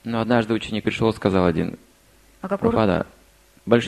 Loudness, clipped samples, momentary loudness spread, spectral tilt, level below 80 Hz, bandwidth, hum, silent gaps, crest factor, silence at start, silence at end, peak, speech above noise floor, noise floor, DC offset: -22 LUFS; under 0.1%; 15 LU; -7 dB/octave; -46 dBFS; 13 kHz; none; none; 20 dB; 0.05 s; 0 s; -2 dBFS; 33 dB; -54 dBFS; under 0.1%